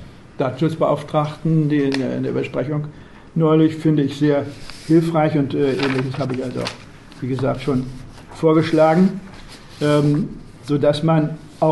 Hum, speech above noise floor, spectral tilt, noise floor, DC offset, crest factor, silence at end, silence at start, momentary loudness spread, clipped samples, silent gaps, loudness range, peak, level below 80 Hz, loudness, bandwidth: none; 20 dB; -7.5 dB/octave; -38 dBFS; 0.3%; 16 dB; 0 s; 0 s; 16 LU; under 0.1%; none; 3 LU; -4 dBFS; -46 dBFS; -19 LUFS; 12 kHz